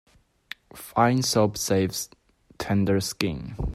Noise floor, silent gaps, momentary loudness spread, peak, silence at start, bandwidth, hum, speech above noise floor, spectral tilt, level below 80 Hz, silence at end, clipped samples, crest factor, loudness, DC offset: -46 dBFS; none; 18 LU; -4 dBFS; 0.75 s; 16 kHz; none; 21 dB; -5 dB/octave; -44 dBFS; 0 s; under 0.1%; 22 dB; -24 LUFS; under 0.1%